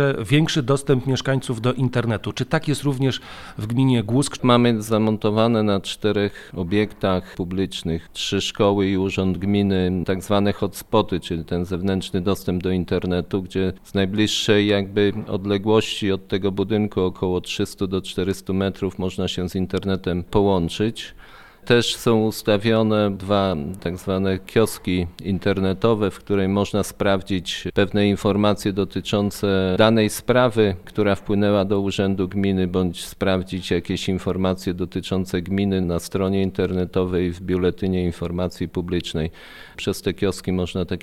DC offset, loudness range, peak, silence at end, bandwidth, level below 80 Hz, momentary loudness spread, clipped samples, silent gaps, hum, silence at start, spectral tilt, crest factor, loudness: under 0.1%; 4 LU; -2 dBFS; 0 s; 15.5 kHz; -44 dBFS; 7 LU; under 0.1%; none; none; 0 s; -6 dB/octave; 20 dB; -22 LUFS